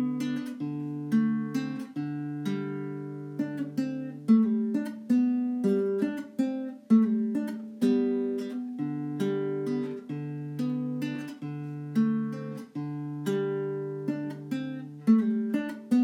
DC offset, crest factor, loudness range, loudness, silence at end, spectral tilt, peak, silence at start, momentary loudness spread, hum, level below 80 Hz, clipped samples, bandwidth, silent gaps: under 0.1%; 18 dB; 5 LU; -30 LUFS; 0 s; -8 dB/octave; -12 dBFS; 0 s; 12 LU; none; -84 dBFS; under 0.1%; 12 kHz; none